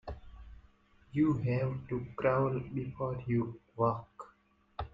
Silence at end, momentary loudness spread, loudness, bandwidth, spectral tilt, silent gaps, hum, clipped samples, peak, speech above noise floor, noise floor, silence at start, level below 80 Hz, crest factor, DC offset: 0.05 s; 20 LU; -34 LUFS; 7.2 kHz; -10 dB/octave; none; none; under 0.1%; -16 dBFS; 35 dB; -67 dBFS; 0.05 s; -56 dBFS; 18 dB; under 0.1%